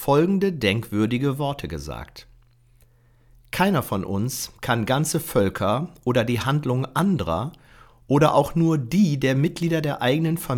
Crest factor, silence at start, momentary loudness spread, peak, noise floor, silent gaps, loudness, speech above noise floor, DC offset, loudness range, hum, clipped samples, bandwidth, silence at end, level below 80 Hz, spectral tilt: 18 dB; 0 s; 9 LU; -4 dBFS; -56 dBFS; none; -22 LUFS; 34 dB; under 0.1%; 6 LU; none; under 0.1%; 19 kHz; 0 s; -48 dBFS; -6 dB/octave